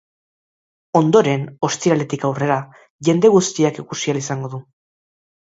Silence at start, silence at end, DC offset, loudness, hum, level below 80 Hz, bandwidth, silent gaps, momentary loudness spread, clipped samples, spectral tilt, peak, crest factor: 0.95 s; 0.95 s; under 0.1%; -18 LUFS; none; -62 dBFS; 8 kHz; 2.90-2.99 s; 11 LU; under 0.1%; -5.5 dB/octave; 0 dBFS; 18 dB